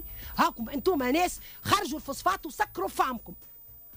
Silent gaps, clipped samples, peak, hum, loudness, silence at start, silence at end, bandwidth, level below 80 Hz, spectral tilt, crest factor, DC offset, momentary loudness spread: none; under 0.1%; -12 dBFS; none; -29 LUFS; 0 s; 0 s; 16 kHz; -52 dBFS; -3.5 dB/octave; 18 dB; under 0.1%; 16 LU